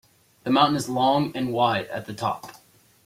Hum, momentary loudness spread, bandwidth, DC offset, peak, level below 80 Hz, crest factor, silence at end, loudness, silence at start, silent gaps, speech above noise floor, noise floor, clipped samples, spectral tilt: none; 14 LU; 16 kHz; under 0.1%; -6 dBFS; -62 dBFS; 20 dB; 0.55 s; -23 LUFS; 0.45 s; none; 33 dB; -56 dBFS; under 0.1%; -5 dB/octave